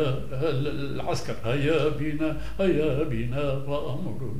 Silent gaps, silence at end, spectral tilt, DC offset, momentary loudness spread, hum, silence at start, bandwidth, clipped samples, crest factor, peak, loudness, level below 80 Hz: none; 0 s; -7 dB/octave; 3%; 6 LU; none; 0 s; 15.5 kHz; under 0.1%; 16 dB; -12 dBFS; -28 LUFS; -42 dBFS